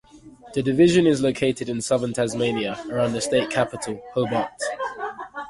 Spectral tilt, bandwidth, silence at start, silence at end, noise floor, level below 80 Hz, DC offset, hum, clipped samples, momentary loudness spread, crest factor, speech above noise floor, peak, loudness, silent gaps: -5 dB/octave; 11.5 kHz; 0.15 s; 0 s; -46 dBFS; -54 dBFS; under 0.1%; none; under 0.1%; 12 LU; 18 dB; 24 dB; -4 dBFS; -23 LUFS; none